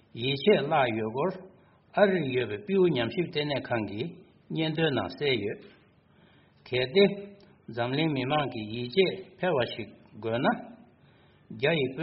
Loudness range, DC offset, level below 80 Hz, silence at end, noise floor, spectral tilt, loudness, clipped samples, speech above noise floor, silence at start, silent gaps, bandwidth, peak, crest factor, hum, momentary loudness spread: 4 LU; under 0.1%; -64 dBFS; 0 s; -60 dBFS; -4 dB/octave; -28 LUFS; under 0.1%; 33 dB; 0.15 s; none; 5.8 kHz; -8 dBFS; 20 dB; none; 15 LU